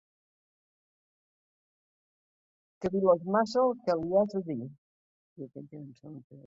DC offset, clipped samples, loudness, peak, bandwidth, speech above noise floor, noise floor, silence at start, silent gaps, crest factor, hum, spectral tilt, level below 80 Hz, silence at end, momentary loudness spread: under 0.1%; under 0.1%; -29 LUFS; -12 dBFS; 7.8 kHz; over 60 dB; under -90 dBFS; 2.8 s; 4.78-5.36 s, 6.24-6.30 s; 22 dB; none; -7 dB/octave; -70 dBFS; 0.05 s; 21 LU